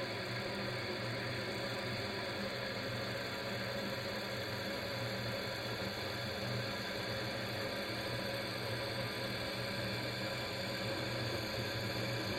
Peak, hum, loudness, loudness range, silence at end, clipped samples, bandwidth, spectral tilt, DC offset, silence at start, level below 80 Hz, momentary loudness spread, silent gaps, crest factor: -26 dBFS; none; -39 LUFS; 1 LU; 0 s; under 0.1%; 16 kHz; -4.5 dB/octave; under 0.1%; 0 s; -62 dBFS; 1 LU; none; 14 dB